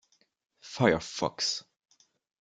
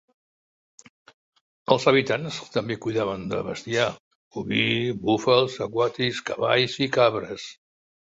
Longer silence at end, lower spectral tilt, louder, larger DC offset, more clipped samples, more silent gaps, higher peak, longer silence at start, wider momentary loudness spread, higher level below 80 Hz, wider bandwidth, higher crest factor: first, 0.8 s vs 0.65 s; about the same, -4 dB/octave vs -5 dB/octave; second, -29 LUFS vs -24 LUFS; neither; neither; second, none vs 4.00-4.31 s; second, -8 dBFS vs -2 dBFS; second, 0.65 s vs 1.7 s; about the same, 11 LU vs 12 LU; about the same, -64 dBFS vs -60 dBFS; first, 9.6 kHz vs 8 kHz; about the same, 26 dB vs 22 dB